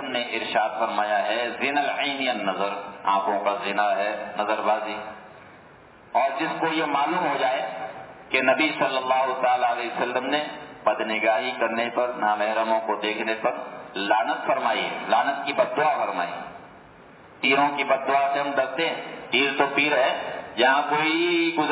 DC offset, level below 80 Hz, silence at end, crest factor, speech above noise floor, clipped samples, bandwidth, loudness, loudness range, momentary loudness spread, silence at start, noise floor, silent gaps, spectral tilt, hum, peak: under 0.1%; -70 dBFS; 0 s; 18 dB; 26 dB; under 0.1%; 4 kHz; -24 LUFS; 4 LU; 8 LU; 0 s; -49 dBFS; none; -7.5 dB/octave; none; -6 dBFS